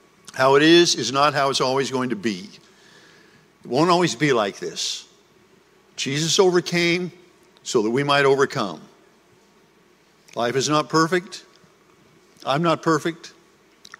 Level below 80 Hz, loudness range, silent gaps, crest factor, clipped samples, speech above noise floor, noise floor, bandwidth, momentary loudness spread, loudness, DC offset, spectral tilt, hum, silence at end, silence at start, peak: -66 dBFS; 5 LU; none; 20 dB; under 0.1%; 37 dB; -57 dBFS; 15.5 kHz; 17 LU; -20 LUFS; under 0.1%; -4 dB/octave; none; 0.7 s; 0.35 s; -2 dBFS